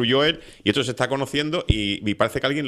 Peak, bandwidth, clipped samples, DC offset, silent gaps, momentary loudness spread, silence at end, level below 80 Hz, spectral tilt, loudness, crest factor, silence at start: -2 dBFS; 14 kHz; under 0.1%; under 0.1%; none; 4 LU; 0 s; -36 dBFS; -5 dB/octave; -22 LUFS; 20 dB; 0 s